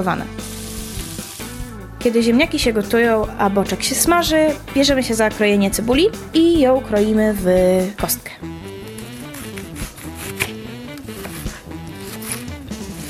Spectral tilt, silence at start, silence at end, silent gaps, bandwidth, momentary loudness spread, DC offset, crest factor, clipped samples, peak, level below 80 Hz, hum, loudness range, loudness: -4 dB/octave; 0 s; 0 s; none; 17 kHz; 17 LU; under 0.1%; 18 dB; under 0.1%; 0 dBFS; -36 dBFS; none; 13 LU; -17 LUFS